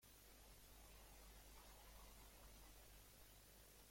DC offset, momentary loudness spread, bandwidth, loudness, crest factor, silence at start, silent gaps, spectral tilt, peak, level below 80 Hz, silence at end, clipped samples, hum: under 0.1%; 2 LU; 16.5 kHz; -65 LUFS; 14 dB; 0 s; none; -2.5 dB/octave; -50 dBFS; -68 dBFS; 0 s; under 0.1%; none